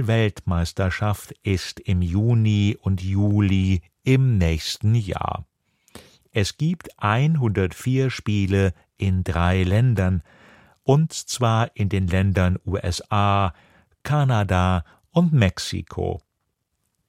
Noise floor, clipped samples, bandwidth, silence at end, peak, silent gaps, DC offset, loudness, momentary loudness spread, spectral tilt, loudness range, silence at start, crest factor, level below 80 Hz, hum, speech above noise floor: -75 dBFS; under 0.1%; 14.5 kHz; 0.9 s; -2 dBFS; none; under 0.1%; -22 LUFS; 8 LU; -6.5 dB/octave; 3 LU; 0 s; 18 dB; -40 dBFS; none; 55 dB